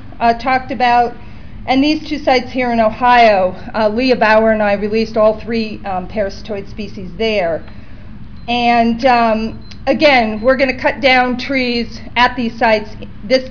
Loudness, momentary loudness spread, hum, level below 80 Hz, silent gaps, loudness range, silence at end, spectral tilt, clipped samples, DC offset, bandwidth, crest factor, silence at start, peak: -14 LUFS; 13 LU; none; -36 dBFS; none; 6 LU; 0 s; -5.5 dB/octave; under 0.1%; 3%; 5.4 kHz; 12 dB; 0 s; -2 dBFS